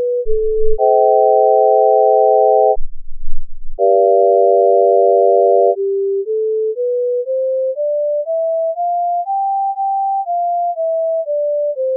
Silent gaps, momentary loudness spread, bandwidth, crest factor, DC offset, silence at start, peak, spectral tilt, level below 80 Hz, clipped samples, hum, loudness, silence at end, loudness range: none; 7 LU; 0.9 kHz; 12 dB; under 0.1%; 0 s; -2 dBFS; -12 dB/octave; -28 dBFS; under 0.1%; none; -14 LUFS; 0 s; 5 LU